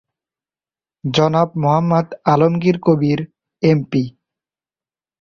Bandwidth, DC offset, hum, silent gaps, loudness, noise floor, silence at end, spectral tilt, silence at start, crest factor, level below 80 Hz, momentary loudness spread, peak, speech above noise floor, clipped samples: 7.2 kHz; under 0.1%; none; none; -17 LUFS; under -90 dBFS; 1.1 s; -7.5 dB/octave; 1.05 s; 18 dB; -56 dBFS; 8 LU; -2 dBFS; over 75 dB; under 0.1%